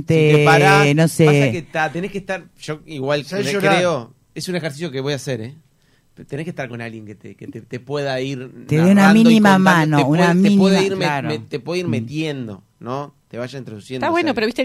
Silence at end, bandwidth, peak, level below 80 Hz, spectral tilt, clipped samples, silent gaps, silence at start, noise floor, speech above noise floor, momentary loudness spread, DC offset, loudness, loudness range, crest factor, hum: 0 s; 15 kHz; -2 dBFS; -56 dBFS; -6 dB/octave; under 0.1%; none; 0 s; -57 dBFS; 40 dB; 20 LU; under 0.1%; -16 LUFS; 14 LU; 16 dB; none